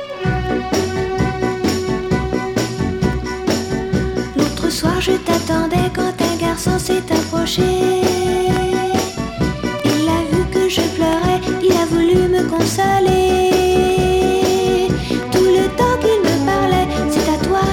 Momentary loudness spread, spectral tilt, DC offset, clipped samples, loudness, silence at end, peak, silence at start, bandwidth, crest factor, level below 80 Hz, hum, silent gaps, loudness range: 6 LU; -5.5 dB/octave; under 0.1%; under 0.1%; -16 LUFS; 0 s; 0 dBFS; 0 s; 17 kHz; 16 dB; -32 dBFS; none; none; 5 LU